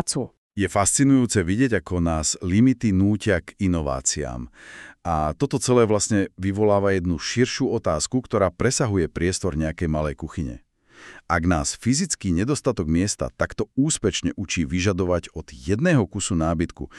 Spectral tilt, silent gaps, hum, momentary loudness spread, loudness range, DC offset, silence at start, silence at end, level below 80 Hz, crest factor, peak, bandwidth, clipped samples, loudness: -5 dB/octave; 0.38-0.51 s; none; 9 LU; 4 LU; under 0.1%; 0 s; 0 s; -40 dBFS; 18 dB; -6 dBFS; 13 kHz; under 0.1%; -22 LUFS